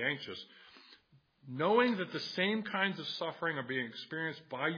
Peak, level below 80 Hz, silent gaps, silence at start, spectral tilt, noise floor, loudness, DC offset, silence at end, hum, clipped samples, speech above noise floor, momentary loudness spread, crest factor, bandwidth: -16 dBFS; -86 dBFS; none; 0 s; -5.5 dB/octave; -67 dBFS; -34 LUFS; under 0.1%; 0 s; none; under 0.1%; 32 dB; 13 LU; 20 dB; 5.2 kHz